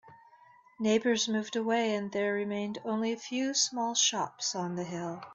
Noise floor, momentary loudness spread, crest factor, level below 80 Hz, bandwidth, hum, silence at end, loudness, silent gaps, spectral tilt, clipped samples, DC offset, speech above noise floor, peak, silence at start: -59 dBFS; 8 LU; 18 dB; -76 dBFS; 8.2 kHz; none; 0 s; -30 LUFS; none; -3 dB/octave; under 0.1%; under 0.1%; 28 dB; -14 dBFS; 0.05 s